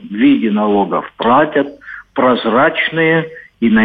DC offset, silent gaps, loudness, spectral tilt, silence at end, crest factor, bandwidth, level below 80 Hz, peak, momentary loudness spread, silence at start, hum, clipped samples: under 0.1%; none; -14 LUFS; -9 dB/octave; 0 s; 12 dB; 4.8 kHz; -52 dBFS; -2 dBFS; 9 LU; 0 s; none; under 0.1%